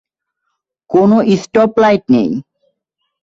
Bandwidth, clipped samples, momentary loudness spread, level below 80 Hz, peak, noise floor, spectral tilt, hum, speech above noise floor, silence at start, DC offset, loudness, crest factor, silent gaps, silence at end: 7.8 kHz; under 0.1%; 7 LU; -52 dBFS; 0 dBFS; -72 dBFS; -7 dB/octave; none; 61 dB; 0.9 s; under 0.1%; -12 LUFS; 14 dB; none; 0.8 s